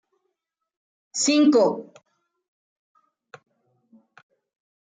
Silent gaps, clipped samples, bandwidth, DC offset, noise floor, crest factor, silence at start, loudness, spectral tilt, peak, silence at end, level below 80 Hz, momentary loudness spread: none; under 0.1%; 9.6 kHz; under 0.1%; -82 dBFS; 20 dB; 1.15 s; -20 LUFS; -3 dB/octave; -8 dBFS; 3.05 s; -80 dBFS; 16 LU